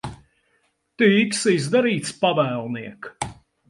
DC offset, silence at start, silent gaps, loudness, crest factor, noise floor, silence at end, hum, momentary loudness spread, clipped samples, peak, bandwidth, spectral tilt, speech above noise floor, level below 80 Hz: under 0.1%; 0.05 s; none; -21 LUFS; 18 dB; -67 dBFS; 0.35 s; none; 15 LU; under 0.1%; -6 dBFS; 11.5 kHz; -4.5 dB/octave; 47 dB; -56 dBFS